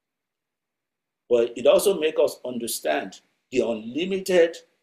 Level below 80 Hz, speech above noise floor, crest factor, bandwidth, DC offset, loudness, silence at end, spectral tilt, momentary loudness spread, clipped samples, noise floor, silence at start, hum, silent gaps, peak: -64 dBFS; 63 dB; 18 dB; 15.5 kHz; under 0.1%; -23 LUFS; 0.25 s; -4 dB/octave; 9 LU; under 0.1%; -86 dBFS; 1.3 s; none; none; -6 dBFS